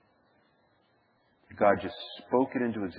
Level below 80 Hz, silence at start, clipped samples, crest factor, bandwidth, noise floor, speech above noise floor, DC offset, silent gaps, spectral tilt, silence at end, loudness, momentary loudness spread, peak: -70 dBFS; 1.5 s; under 0.1%; 24 dB; 5 kHz; -69 dBFS; 40 dB; under 0.1%; none; -9.5 dB/octave; 0 s; -29 LUFS; 11 LU; -8 dBFS